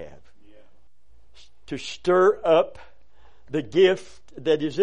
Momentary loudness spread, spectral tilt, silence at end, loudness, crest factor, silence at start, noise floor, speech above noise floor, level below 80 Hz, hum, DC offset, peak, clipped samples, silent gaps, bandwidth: 15 LU; -5.5 dB/octave; 0 s; -22 LUFS; 18 dB; 0 s; -63 dBFS; 41 dB; -58 dBFS; none; 0.8%; -6 dBFS; under 0.1%; none; 9.8 kHz